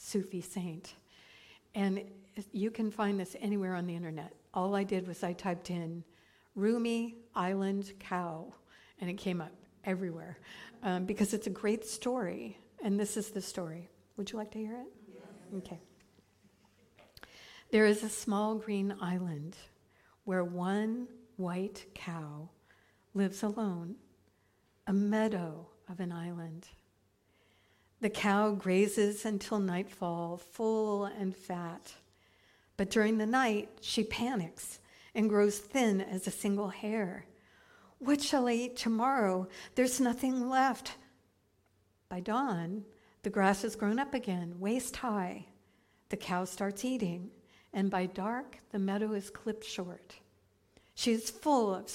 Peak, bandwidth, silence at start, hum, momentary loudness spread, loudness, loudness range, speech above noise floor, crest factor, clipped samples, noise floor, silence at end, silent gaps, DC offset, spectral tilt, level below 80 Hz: -14 dBFS; 16 kHz; 0 s; none; 17 LU; -34 LUFS; 6 LU; 38 dB; 20 dB; under 0.1%; -72 dBFS; 0 s; none; under 0.1%; -5 dB/octave; -68 dBFS